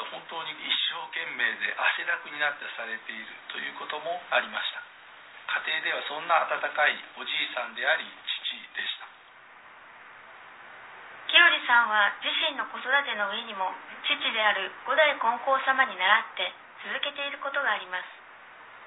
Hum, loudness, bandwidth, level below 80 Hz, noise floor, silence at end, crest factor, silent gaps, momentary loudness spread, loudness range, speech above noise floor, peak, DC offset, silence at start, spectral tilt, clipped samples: none; -26 LUFS; 4.1 kHz; -84 dBFS; -52 dBFS; 0 s; 24 dB; none; 19 LU; 8 LU; 23 dB; -6 dBFS; under 0.1%; 0 s; -3.5 dB/octave; under 0.1%